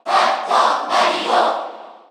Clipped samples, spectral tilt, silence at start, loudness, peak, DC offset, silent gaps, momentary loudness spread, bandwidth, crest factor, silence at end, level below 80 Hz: under 0.1%; -1.5 dB/octave; 0.05 s; -17 LUFS; -2 dBFS; under 0.1%; none; 7 LU; 13 kHz; 16 dB; 0.15 s; -86 dBFS